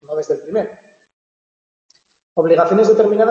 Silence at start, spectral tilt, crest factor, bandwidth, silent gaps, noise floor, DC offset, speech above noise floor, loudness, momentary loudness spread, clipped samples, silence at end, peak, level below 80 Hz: 0.1 s; -7 dB/octave; 16 dB; 7.4 kHz; 1.13-1.89 s, 2.23-2.36 s; under -90 dBFS; under 0.1%; over 76 dB; -15 LUFS; 11 LU; under 0.1%; 0 s; -2 dBFS; -66 dBFS